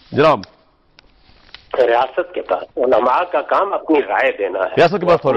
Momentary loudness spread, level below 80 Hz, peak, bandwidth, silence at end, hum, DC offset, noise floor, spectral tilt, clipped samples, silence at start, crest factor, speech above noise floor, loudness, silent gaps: 7 LU; -50 dBFS; -2 dBFS; 7.4 kHz; 0 s; none; under 0.1%; -52 dBFS; -6.5 dB/octave; under 0.1%; 0.1 s; 14 dB; 36 dB; -16 LUFS; none